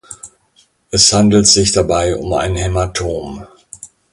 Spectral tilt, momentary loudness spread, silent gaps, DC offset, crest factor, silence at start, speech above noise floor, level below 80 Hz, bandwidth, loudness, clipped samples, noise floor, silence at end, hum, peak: -3.5 dB/octave; 24 LU; none; under 0.1%; 16 dB; 0.1 s; 42 dB; -32 dBFS; 11.5 kHz; -12 LUFS; under 0.1%; -55 dBFS; 0.25 s; none; 0 dBFS